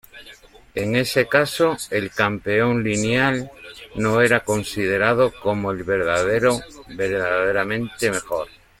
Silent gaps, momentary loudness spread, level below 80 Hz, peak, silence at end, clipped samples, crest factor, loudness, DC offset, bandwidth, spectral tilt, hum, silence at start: none; 10 LU; -50 dBFS; -2 dBFS; 0.3 s; under 0.1%; 20 dB; -20 LUFS; under 0.1%; 16.5 kHz; -5 dB/octave; none; 0.15 s